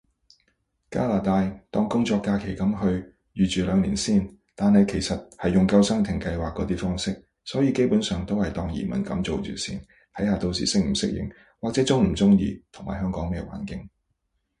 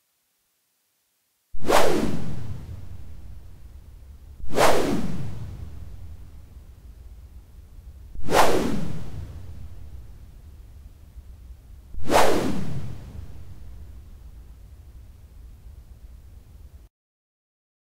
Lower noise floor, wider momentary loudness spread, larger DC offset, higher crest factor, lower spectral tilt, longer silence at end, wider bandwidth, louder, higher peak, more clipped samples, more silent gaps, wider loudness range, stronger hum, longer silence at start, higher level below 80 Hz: first, -75 dBFS vs -71 dBFS; second, 13 LU vs 27 LU; neither; about the same, 18 dB vs 20 dB; first, -6 dB/octave vs -4.5 dB/octave; second, 0.75 s vs 1.1 s; second, 11 kHz vs 16 kHz; about the same, -24 LUFS vs -25 LUFS; about the same, -6 dBFS vs -4 dBFS; neither; neither; second, 4 LU vs 18 LU; neither; second, 0.9 s vs 1.55 s; about the same, -42 dBFS vs -42 dBFS